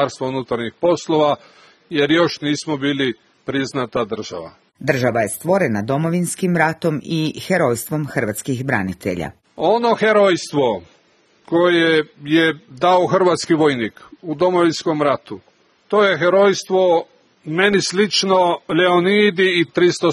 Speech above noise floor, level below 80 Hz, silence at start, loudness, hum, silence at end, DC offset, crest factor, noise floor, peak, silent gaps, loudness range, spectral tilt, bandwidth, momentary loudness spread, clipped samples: 39 dB; -58 dBFS; 0 s; -18 LUFS; none; 0 s; under 0.1%; 18 dB; -56 dBFS; 0 dBFS; none; 5 LU; -5 dB/octave; 13 kHz; 10 LU; under 0.1%